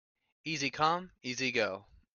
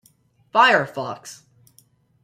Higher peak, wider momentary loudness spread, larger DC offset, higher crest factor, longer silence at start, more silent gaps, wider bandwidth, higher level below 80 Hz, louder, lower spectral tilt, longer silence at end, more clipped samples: second, -14 dBFS vs -2 dBFS; second, 12 LU vs 21 LU; neither; about the same, 22 dB vs 22 dB; about the same, 0.45 s vs 0.55 s; neither; second, 7.4 kHz vs 16 kHz; about the same, -70 dBFS vs -72 dBFS; second, -33 LUFS vs -19 LUFS; about the same, -3.5 dB/octave vs -3.5 dB/octave; second, 0.3 s vs 0.9 s; neither